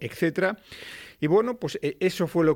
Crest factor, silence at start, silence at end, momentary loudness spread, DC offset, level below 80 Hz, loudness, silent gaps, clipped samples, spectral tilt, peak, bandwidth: 14 dB; 0 s; 0 s; 16 LU; under 0.1%; -60 dBFS; -26 LUFS; none; under 0.1%; -6.5 dB/octave; -12 dBFS; 17 kHz